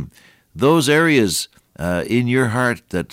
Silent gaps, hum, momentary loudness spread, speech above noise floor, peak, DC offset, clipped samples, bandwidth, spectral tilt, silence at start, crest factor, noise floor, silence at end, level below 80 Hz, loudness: none; none; 12 LU; 27 dB; -4 dBFS; under 0.1%; under 0.1%; 16.5 kHz; -5 dB/octave; 0 s; 14 dB; -44 dBFS; 0.05 s; -48 dBFS; -17 LUFS